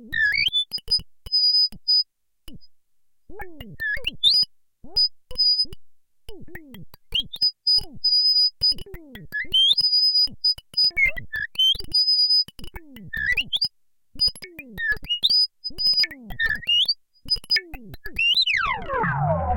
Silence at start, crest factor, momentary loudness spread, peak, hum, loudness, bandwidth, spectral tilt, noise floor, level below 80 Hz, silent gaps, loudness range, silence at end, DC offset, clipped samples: 0 s; 16 dB; 12 LU; -6 dBFS; none; -20 LUFS; 17 kHz; -2.5 dB/octave; -62 dBFS; -44 dBFS; none; 5 LU; 0 s; under 0.1%; under 0.1%